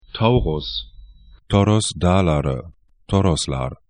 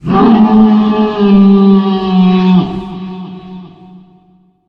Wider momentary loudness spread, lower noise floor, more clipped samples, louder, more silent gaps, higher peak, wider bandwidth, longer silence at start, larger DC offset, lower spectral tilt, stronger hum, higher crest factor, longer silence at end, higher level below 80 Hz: second, 11 LU vs 18 LU; about the same, -45 dBFS vs -48 dBFS; neither; second, -20 LUFS vs -8 LUFS; neither; about the same, 0 dBFS vs 0 dBFS; first, 10.5 kHz vs 5.6 kHz; about the same, 0.15 s vs 0.05 s; neither; second, -6 dB/octave vs -10 dB/octave; neither; first, 20 dB vs 10 dB; second, 0.15 s vs 1 s; about the same, -34 dBFS vs -38 dBFS